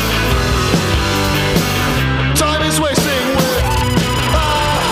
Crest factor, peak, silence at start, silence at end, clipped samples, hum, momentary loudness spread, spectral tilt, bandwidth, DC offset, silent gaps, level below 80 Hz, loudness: 14 dB; 0 dBFS; 0 s; 0 s; under 0.1%; none; 1 LU; -4 dB/octave; 16 kHz; under 0.1%; none; -24 dBFS; -14 LUFS